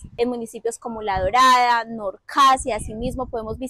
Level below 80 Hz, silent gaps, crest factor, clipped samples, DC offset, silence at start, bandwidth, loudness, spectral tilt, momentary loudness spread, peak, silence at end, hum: -40 dBFS; none; 12 dB; under 0.1%; under 0.1%; 0 s; 15.5 kHz; -20 LUFS; -3.5 dB/octave; 14 LU; -10 dBFS; 0 s; none